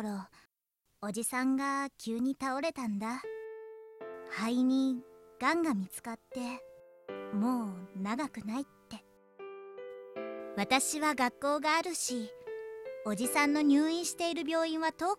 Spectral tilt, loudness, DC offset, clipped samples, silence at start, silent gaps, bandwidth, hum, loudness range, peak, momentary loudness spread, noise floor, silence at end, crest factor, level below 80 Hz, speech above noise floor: -3.5 dB/octave; -33 LUFS; under 0.1%; under 0.1%; 0 s; none; 15 kHz; none; 7 LU; -14 dBFS; 18 LU; -80 dBFS; 0 s; 20 dB; -74 dBFS; 48 dB